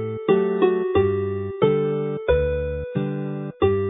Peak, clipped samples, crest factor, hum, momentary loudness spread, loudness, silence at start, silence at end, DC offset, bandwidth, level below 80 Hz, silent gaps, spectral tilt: -4 dBFS; under 0.1%; 18 dB; none; 7 LU; -22 LUFS; 0 s; 0 s; under 0.1%; 3.9 kHz; -36 dBFS; none; -12 dB/octave